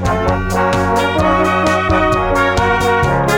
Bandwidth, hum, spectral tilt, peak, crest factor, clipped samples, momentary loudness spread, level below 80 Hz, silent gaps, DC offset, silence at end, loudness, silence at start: over 20 kHz; none; -5.5 dB/octave; -2 dBFS; 10 dB; under 0.1%; 2 LU; -26 dBFS; none; under 0.1%; 0 s; -14 LUFS; 0 s